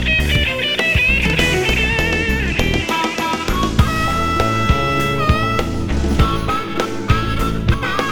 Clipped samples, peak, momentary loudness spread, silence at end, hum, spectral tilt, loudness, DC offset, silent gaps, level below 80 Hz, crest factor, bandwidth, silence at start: under 0.1%; 0 dBFS; 6 LU; 0 s; none; -5 dB/octave; -17 LUFS; under 0.1%; none; -24 dBFS; 16 dB; 19.5 kHz; 0 s